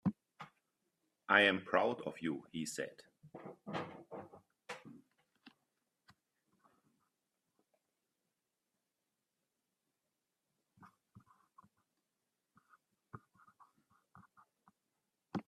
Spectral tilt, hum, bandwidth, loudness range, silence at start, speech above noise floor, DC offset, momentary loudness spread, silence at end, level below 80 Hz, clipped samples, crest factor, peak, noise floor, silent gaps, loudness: -4.5 dB/octave; none; 13.5 kHz; 23 LU; 0.05 s; 53 dB; under 0.1%; 28 LU; 0.05 s; -84 dBFS; under 0.1%; 32 dB; -12 dBFS; -89 dBFS; none; -36 LUFS